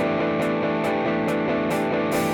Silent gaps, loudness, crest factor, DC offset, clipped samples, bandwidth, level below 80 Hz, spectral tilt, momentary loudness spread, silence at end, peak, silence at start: none; -23 LUFS; 10 dB; under 0.1%; under 0.1%; 19.5 kHz; -54 dBFS; -6 dB/octave; 0 LU; 0 s; -12 dBFS; 0 s